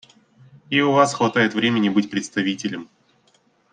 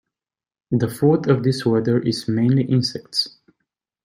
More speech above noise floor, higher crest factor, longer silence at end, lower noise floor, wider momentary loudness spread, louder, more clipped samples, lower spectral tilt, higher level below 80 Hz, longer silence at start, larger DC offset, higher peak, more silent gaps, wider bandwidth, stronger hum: second, 41 dB vs over 71 dB; about the same, 20 dB vs 16 dB; first, 0.9 s vs 0.75 s; second, -61 dBFS vs under -90 dBFS; first, 10 LU vs 5 LU; about the same, -20 LUFS vs -20 LUFS; neither; second, -4.5 dB/octave vs -6.5 dB/octave; second, -66 dBFS vs -60 dBFS; about the same, 0.7 s vs 0.7 s; neither; about the same, -2 dBFS vs -4 dBFS; neither; second, 9.6 kHz vs 16 kHz; neither